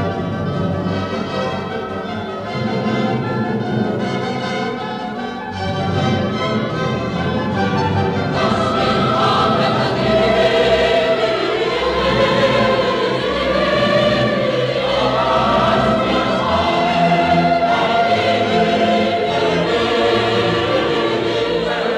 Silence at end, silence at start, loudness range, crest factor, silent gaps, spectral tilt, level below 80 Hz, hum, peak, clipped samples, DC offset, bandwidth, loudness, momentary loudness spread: 0 s; 0 s; 6 LU; 14 dB; none; -6 dB/octave; -40 dBFS; none; -2 dBFS; under 0.1%; under 0.1%; 12 kHz; -17 LUFS; 7 LU